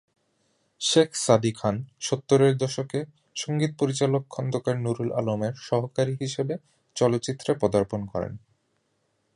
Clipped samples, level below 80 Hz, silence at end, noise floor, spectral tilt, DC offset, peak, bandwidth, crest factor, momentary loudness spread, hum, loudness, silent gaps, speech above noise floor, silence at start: under 0.1%; -58 dBFS; 1 s; -72 dBFS; -5.5 dB/octave; under 0.1%; -4 dBFS; 11.5 kHz; 22 dB; 11 LU; none; -26 LUFS; none; 47 dB; 0.8 s